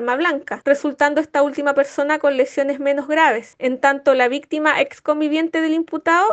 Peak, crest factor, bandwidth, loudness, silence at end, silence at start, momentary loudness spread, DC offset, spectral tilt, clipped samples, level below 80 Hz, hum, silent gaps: 0 dBFS; 18 dB; 8.4 kHz; -18 LUFS; 0 s; 0 s; 5 LU; under 0.1%; -3 dB/octave; under 0.1%; -68 dBFS; none; none